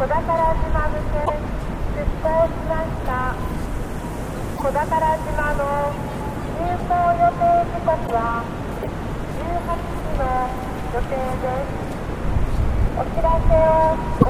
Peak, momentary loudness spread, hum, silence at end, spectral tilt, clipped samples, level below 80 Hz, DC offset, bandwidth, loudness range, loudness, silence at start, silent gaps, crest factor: 0 dBFS; 10 LU; none; 0 s; -7.5 dB/octave; under 0.1%; -26 dBFS; under 0.1%; 15.5 kHz; 4 LU; -22 LUFS; 0 s; none; 20 dB